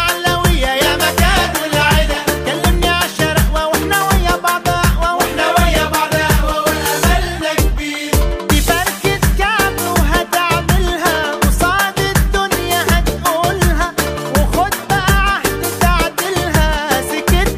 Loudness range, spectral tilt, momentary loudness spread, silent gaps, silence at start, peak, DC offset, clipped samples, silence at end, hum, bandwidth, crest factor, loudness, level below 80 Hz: 1 LU; -4 dB/octave; 4 LU; none; 0 s; 0 dBFS; under 0.1%; under 0.1%; 0 s; none; 15.5 kHz; 14 dB; -14 LUFS; -20 dBFS